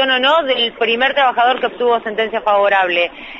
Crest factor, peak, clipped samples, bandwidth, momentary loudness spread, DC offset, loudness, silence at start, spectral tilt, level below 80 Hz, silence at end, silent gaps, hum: 14 dB; -2 dBFS; under 0.1%; 7.4 kHz; 5 LU; under 0.1%; -14 LUFS; 0 s; -4 dB/octave; -54 dBFS; 0 s; none; none